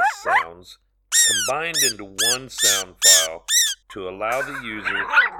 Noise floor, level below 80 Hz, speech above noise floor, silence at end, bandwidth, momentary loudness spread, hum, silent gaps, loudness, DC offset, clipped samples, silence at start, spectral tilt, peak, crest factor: -49 dBFS; -56 dBFS; 29 dB; 0 s; 19 kHz; 14 LU; none; none; -18 LUFS; under 0.1%; under 0.1%; 0 s; 1 dB/octave; -2 dBFS; 18 dB